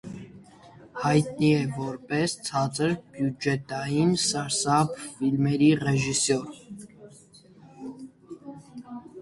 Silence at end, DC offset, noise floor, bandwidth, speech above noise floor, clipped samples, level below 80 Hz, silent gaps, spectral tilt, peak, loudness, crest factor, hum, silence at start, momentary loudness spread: 0 s; under 0.1%; -53 dBFS; 11.5 kHz; 28 dB; under 0.1%; -60 dBFS; none; -5 dB/octave; -8 dBFS; -25 LUFS; 18 dB; none; 0.05 s; 21 LU